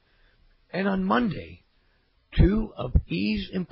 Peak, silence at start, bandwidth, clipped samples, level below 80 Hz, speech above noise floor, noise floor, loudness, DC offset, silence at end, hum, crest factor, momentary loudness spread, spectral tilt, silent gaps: -8 dBFS; 0.75 s; 5.8 kHz; under 0.1%; -32 dBFS; 41 dB; -65 dBFS; -26 LUFS; under 0.1%; 0.05 s; none; 18 dB; 11 LU; -11.5 dB/octave; none